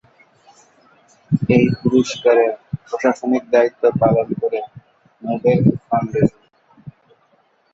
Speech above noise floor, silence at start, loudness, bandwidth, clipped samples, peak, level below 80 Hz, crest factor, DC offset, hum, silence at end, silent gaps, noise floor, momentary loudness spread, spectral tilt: 43 dB; 1.3 s; -17 LUFS; 7.8 kHz; under 0.1%; -2 dBFS; -50 dBFS; 18 dB; under 0.1%; none; 0.85 s; none; -59 dBFS; 11 LU; -7.5 dB/octave